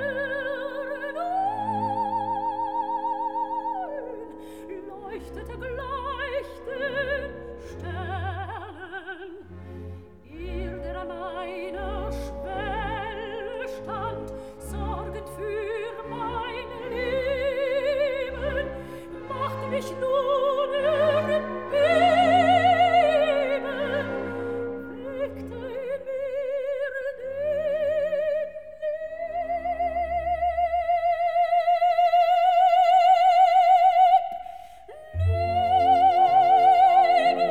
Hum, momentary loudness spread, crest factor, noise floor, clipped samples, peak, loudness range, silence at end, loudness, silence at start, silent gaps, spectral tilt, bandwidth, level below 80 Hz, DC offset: none; 19 LU; 16 dB; -44 dBFS; under 0.1%; -8 dBFS; 13 LU; 0 s; -24 LUFS; 0 s; none; -6 dB/octave; 11 kHz; -46 dBFS; 0.2%